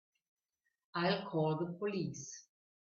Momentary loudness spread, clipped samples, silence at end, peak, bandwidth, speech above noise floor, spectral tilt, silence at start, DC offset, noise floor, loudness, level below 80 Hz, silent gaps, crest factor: 13 LU; under 0.1%; 0.55 s; -20 dBFS; 7.4 kHz; 50 dB; -5.5 dB/octave; 0.95 s; under 0.1%; -87 dBFS; -38 LUFS; -78 dBFS; none; 20 dB